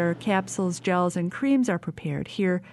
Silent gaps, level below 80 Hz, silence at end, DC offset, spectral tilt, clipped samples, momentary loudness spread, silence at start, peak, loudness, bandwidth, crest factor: none; -62 dBFS; 0 s; under 0.1%; -6 dB/octave; under 0.1%; 7 LU; 0 s; -10 dBFS; -26 LUFS; 12 kHz; 14 dB